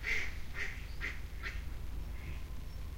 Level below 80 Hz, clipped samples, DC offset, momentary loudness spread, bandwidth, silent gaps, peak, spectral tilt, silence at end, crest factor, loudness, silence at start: -44 dBFS; under 0.1%; under 0.1%; 8 LU; 16 kHz; none; -22 dBFS; -4 dB/octave; 0 s; 16 dB; -42 LUFS; 0 s